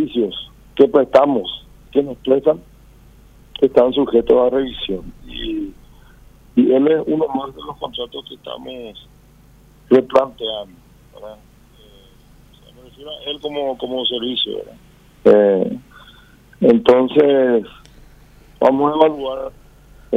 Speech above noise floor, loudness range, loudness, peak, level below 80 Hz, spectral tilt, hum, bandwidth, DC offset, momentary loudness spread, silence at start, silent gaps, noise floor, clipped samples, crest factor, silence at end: 31 dB; 9 LU; -17 LUFS; 0 dBFS; -46 dBFS; -7 dB/octave; none; 8 kHz; under 0.1%; 19 LU; 0 s; none; -47 dBFS; under 0.1%; 18 dB; 0 s